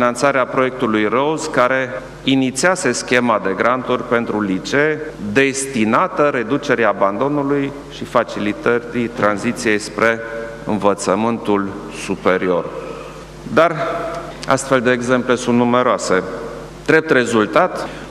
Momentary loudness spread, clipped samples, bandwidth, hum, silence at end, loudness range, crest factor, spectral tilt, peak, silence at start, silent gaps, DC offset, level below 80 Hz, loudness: 11 LU; under 0.1%; 13.5 kHz; none; 0 s; 3 LU; 18 dB; -4.5 dB/octave; 0 dBFS; 0 s; none; under 0.1%; -46 dBFS; -17 LUFS